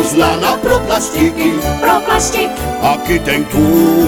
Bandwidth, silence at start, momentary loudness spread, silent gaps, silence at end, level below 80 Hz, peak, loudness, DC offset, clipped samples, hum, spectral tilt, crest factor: over 20 kHz; 0 s; 4 LU; none; 0 s; -28 dBFS; 0 dBFS; -13 LUFS; under 0.1%; under 0.1%; none; -4.5 dB/octave; 12 dB